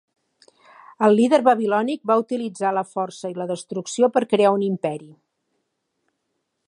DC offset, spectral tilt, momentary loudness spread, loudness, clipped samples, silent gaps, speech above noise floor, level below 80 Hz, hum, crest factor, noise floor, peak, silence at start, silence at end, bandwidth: under 0.1%; -5.5 dB/octave; 12 LU; -21 LUFS; under 0.1%; none; 55 dB; -76 dBFS; none; 20 dB; -76 dBFS; -2 dBFS; 1 s; 1.6 s; 11 kHz